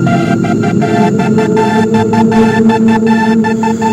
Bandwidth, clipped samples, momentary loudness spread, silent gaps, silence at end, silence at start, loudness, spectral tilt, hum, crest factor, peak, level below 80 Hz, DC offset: 10.5 kHz; 0.1%; 3 LU; none; 0 s; 0 s; -10 LUFS; -7 dB/octave; none; 10 dB; 0 dBFS; -42 dBFS; under 0.1%